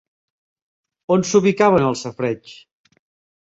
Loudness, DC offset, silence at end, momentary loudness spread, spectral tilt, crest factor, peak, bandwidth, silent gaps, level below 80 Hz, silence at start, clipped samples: -18 LUFS; under 0.1%; 0.85 s; 12 LU; -5.5 dB/octave; 18 dB; -2 dBFS; 8 kHz; none; -56 dBFS; 1.1 s; under 0.1%